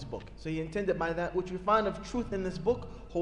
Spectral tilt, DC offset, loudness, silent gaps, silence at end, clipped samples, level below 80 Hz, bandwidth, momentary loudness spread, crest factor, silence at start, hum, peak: -6.5 dB/octave; under 0.1%; -32 LUFS; none; 0 s; under 0.1%; -48 dBFS; 10.5 kHz; 10 LU; 18 dB; 0 s; none; -14 dBFS